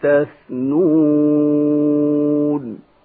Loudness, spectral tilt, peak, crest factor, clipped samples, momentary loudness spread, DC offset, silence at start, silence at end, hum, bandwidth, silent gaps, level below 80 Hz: -16 LUFS; -13.5 dB/octave; -6 dBFS; 10 dB; under 0.1%; 10 LU; under 0.1%; 0 s; 0.25 s; none; 3.6 kHz; none; -64 dBFS